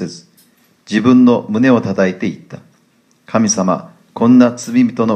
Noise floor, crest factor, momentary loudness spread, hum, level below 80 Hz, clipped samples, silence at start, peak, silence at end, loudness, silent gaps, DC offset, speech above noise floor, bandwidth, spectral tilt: -55 dBFS; 14 dB; 13 LU; none; -58 dBFS; under 0.1%; 0 s; 0 dBFS; 0 s; -13 LUFS; none; under 0.1%; 43 dB; 8.8 kHz; -5.5 dB/octave